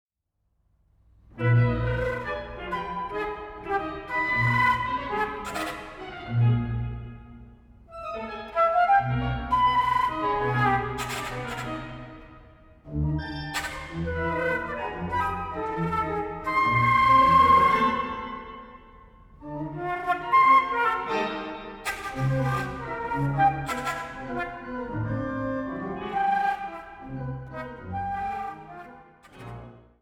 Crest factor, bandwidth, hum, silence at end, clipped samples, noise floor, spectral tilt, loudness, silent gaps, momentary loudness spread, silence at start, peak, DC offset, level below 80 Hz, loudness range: 18 dB; 16.5 kHz; none; 0.2 s; under 0.1%; -76 dBFS; -6 dB/octave; -26 LUFS; none; 18 LU; 1.35 s; -8 dBFS; under 0.1%; -44 dBFS; 9 LU